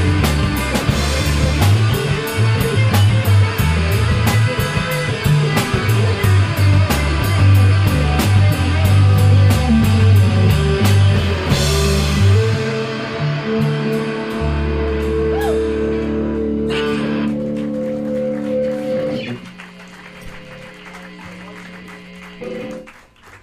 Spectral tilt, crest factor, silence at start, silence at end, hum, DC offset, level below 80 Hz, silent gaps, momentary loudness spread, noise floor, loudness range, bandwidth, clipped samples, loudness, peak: -6 dB/octave; 14 dB; 0 s; 0.05 s; none; under 0.1%; -28 dBFS; none; 22 LU; -43 dBFS; 12 LU; 16 kHz; under 0.1%; -16 LUFS; -2 dBFS